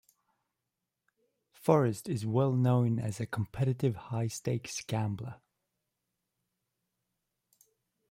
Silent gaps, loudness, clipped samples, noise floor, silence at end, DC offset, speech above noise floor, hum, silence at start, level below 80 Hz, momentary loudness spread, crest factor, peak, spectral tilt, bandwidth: none; -32 LUFS; under 0.1%; -87 dBFS; 2.75 s; under 0.1%; 57 dB; none; 1.65 s; -66 dBFS; 9 LU; 24 dB; -10 dBFS; -7 dB/octave; 16 kHz